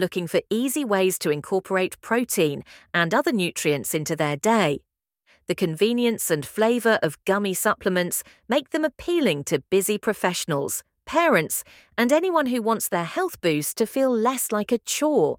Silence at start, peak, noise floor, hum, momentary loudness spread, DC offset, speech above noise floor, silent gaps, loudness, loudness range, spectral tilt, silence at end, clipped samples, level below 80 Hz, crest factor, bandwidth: 0 s; -4 dBFS; -64 dBFS; none; 6 LU; under 0.1%; 41 dB; none; -23 LUFS; 1 LU; -4 dB/octave; 0.05 s; under 0.1%; -62 dBFS; 18 dB; 18 kHz